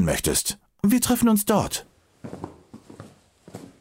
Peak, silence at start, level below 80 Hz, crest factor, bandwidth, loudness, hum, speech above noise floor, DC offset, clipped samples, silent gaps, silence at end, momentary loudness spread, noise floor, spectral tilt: -6 dBFS; 0 s; -46 dBFS; 18 dB; 16.5 kHz; -22 LUFS; none; 29 dB; under 0.1%; under 0.1%; none; 0.15 s; 24 LU; -51 dBFS; -4 dB/octave